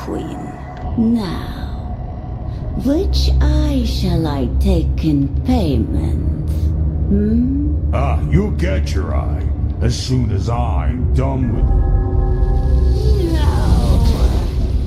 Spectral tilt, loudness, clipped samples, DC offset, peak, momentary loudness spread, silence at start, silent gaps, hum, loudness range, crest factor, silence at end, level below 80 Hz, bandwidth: -7.5 dB/octave; -18 LUFS; under 0.1%; under 0.1%; 0 dBFS; 10 LU; 0 s; none; none; 2 LU; 14 dB; 0 s; -18 dBFS; 12 kHz